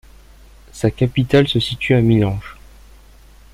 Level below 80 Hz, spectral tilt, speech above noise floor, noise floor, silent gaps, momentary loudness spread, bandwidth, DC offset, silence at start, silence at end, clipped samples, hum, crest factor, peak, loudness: -40 dBFS; -7 dB/octave; 29 dB; -44 dBFS; none; 8 LU; 13 kHz; under 0.1%; 0.75 s; 1 s; under 0.1%; none; 18 dB; -2 dBFS; -17 LUFS